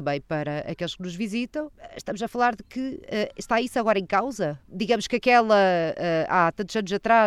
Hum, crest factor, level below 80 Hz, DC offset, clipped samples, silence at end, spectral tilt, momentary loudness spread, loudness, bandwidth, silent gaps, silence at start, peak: none; 18 dB; -56 dBFS; under 0.1%; under 0.1%; 0 s; -5 dB/octave; 12 LU; -25 LUFS; 13 kHz; none; 0 s; -6 dBFS